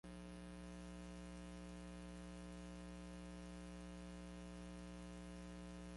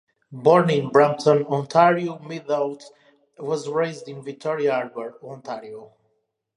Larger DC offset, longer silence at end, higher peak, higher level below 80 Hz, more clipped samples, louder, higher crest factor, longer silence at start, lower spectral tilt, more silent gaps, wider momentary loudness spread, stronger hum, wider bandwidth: neither; second, 0 s vs 0.7 s; second, -44 dBFS vs -2 dBFS; first, -60 dBFS vs -72 dBFS; neither; second, -55 LUFS vs -21 LUFS; second, 10 dB vs 20 dB; second, 0.05 s vs 0.3 s; about the same, -5.5 dB/octave vs -6.5 dB/octave; neither; second, 0 LU vs 18 LU; first, 60 Hz at -55 dBFS vs none; about the same, 11.5 kHz vs 10.5 kHz